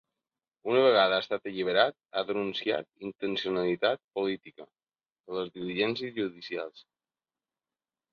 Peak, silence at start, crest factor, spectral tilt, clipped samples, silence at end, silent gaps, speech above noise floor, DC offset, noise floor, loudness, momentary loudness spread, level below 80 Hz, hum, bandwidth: -8 dBFS; 0.65 s; 24 dB; -6 dB/octave; under 0.1%; 1.3 s; 4.04-4.09 s, 5.20-5.24 s; over 61 dB; under 0.1%; under -90 dBFS; -29 LUFS; 13 LU; -74 dBFS; none; 6.8 kHz